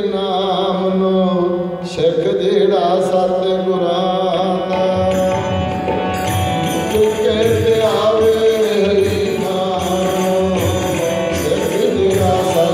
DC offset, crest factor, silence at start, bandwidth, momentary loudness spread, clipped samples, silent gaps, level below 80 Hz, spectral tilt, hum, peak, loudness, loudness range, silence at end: under 0.1%; 12 dB; 0 s; 15.5 kHz; 4 LU; under 0.1%; none; -42 dBFS; -5.5 dB/octave; none; -4 dBFS; -16 LUFS; 2 LU; 0 s